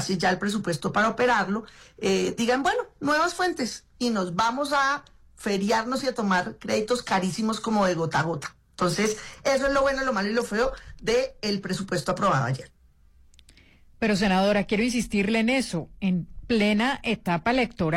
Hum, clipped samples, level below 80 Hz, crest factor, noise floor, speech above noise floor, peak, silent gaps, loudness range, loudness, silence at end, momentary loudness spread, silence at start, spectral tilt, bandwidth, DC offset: none; under 0.1%; -50 dBFS; 12 dB; -56 dBFS; 31 dB; -14 dBFS; none; 2 LU; -25 LUFS; 0 s; 7 LU; 0 s; -4.5 dB/octave; 15.5 kHz; under 0.1%